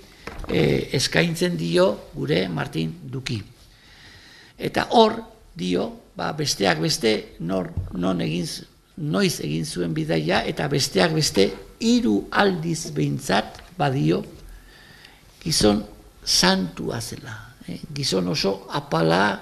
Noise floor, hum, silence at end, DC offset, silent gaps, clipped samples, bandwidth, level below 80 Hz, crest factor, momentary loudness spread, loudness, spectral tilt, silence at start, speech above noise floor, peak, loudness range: -50 dBFS; none; 0 s; under 0.1%; none; under 0.1%; 14.5 kHz; -46 dBFS; 24 dB; 13 LU; -22 LUFS; -4.5 dB/octave; 0.2 s; 27 dB; 0 dBFS; 4 LU